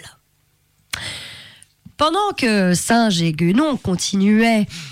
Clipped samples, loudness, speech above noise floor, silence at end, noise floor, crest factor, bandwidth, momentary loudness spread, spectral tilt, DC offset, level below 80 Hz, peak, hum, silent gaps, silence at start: under 0.1%; -17 LUFS; 45 dB; 0 s; -62 dBFS; 12 dB; 16 kHz; 14 LU; -4.5 dB/octave; under 0.1%; -50 dBFS; -8 dBFS; none; none; 0.05 s